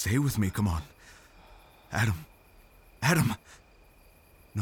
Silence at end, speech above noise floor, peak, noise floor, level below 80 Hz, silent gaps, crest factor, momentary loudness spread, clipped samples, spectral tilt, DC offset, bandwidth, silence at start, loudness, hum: 0 s; 30 dB; -10 dBFS; -58 dBFS; -50 dBFS; none; 20 dB; 14 LU; under 0.1%; -5.5 dB/octave; under 0.1%; over 20 kHz; 0 s; -29 LUFS; none